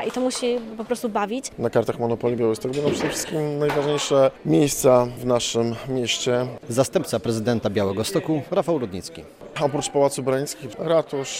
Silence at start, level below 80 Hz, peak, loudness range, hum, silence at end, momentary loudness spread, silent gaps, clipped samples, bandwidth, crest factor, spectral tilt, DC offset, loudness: 0 s; -54 dBFS; -4 dBFS; 3 LU; none; 0 s; 8 LU; none; under 0.1%; 16 kHz; 18 dB; -4.5 dB/octave; under 0.1%; -23 LUFS